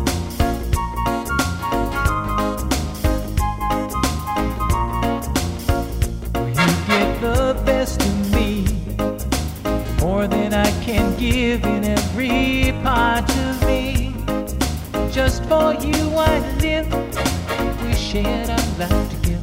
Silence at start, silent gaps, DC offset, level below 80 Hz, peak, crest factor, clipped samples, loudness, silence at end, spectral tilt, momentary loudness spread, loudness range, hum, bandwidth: 0 s; none; under 0.1%; -26 dBFS; -2 dBFS; 16 dB; under 0.1%; -20 LUFS; 0 s; -5.5 dB/octave; 5 LU; 3 LU; none; 16.5 kHz